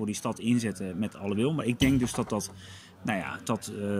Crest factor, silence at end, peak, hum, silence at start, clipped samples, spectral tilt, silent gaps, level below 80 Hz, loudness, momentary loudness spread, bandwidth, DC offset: 18 dB; 0 s; -12 dBFS; none; 0 s; under 0.1%; -5.5 dB/octave; none; -52 dBFS; -30 LUFS; 11 LU; 16 kHz; under 0.1%